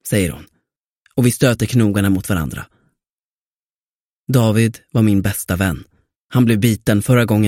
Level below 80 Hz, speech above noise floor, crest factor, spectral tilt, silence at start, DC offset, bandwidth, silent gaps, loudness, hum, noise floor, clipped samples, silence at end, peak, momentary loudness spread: -42 dBFS; over 75 dB; 18 dB; -6 dB/octave; 0.05 s; under 0.1%; 16.5 kHz; 0.87-1.01 s, 3.10-4.25 s, 6.18-6.29 s; -17 LUFS; none; under -90 dBFS; under 0.1%; 0 s; 0 dBFS; 11 LU